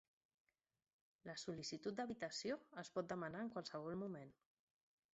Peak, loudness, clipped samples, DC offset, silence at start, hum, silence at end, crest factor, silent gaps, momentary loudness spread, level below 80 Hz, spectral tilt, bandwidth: -32 dBFS; -49 LUFS; under 0.1%; under 0.1%; 1.25 s; none; 0.8 s; 18 dB; none; 7 LU; -84 dBFS; -4 dB/octave; 8 kHz